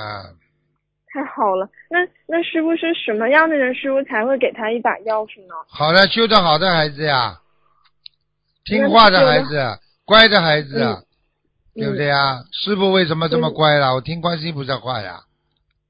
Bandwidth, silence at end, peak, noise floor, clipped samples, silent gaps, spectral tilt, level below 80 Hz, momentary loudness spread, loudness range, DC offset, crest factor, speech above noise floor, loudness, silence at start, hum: 8 kHz; 0.7 s; 0 dBFS; -71 dBFS; under 0.1%; none; -7 dB/octave; -50 dBFS; 16 LU; 5 LU; under 0.1%; 18 dB; 54 dB; -16 LUFS; 0 s; 50 Hz at -50 dBFS